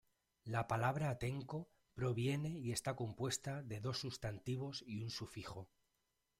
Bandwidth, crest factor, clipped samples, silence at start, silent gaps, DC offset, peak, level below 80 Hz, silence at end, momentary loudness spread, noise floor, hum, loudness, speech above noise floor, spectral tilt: 16 kHz; 20 dB; under 0.1%; 0.45 s; none; under 0.1%; -24 dBFS; -68 dBFS; 0.75 s; 11 LU; -85 dBFS; none; -43 LUFS; 43 dB; -5 dB/octave